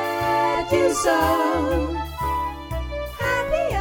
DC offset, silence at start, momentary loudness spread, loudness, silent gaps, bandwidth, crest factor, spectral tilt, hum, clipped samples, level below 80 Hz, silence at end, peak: under 0.1%; 0 s; 10 LU; -22 LUFS; none; 19 kHz; 16 dB; -5 dB/octave; none; under 0.1%; -34 dBFS; 0 s; -6 dBFS